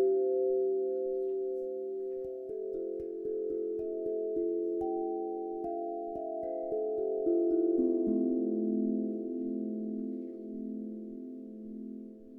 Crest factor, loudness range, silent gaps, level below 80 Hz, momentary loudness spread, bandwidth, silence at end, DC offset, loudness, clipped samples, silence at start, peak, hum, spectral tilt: 14 dB; 5 LU; none; -68 dBFS; 13 LU; 1.6 kHz; 0 s; under 0.1%; -34 LUFS; under 0.1%; 0 s; -18 dBFS; none; -12 dB/octave